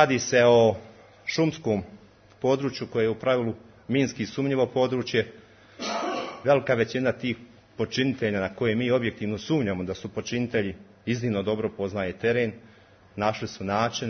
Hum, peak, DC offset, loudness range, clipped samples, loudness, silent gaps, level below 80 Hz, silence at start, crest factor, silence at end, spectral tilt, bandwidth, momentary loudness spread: none; -4 dBFS; under 0.1%; 3 LU; under 0.1%; -26 LUFS; none; -62 dBFS; 0 s; 22 dB; 0 s; -5.5 dB/octave; 6.6 kHz; 11 LU